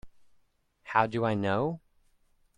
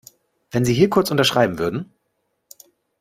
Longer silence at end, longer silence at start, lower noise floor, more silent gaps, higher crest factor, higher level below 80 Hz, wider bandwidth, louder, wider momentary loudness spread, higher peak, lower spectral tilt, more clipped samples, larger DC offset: second, 0.8 s vs 1.15 s; second, 0.05 s vs 0.55 s; about the same, -69 dBFS vs -72 dBFS; neither; about the same, 24 dB vs 20 dB; second, -62 dBFS vs -52 dBFS; second, 10.5 kHz vs 16 kHz; second, -29 LUFS vs -19 LUFS; second, 7 LU vs 12 LU; second, -8 dBFS vs -2 dBFS; first, -7.5 dB/octave vs -5 dB/octave; neither; neither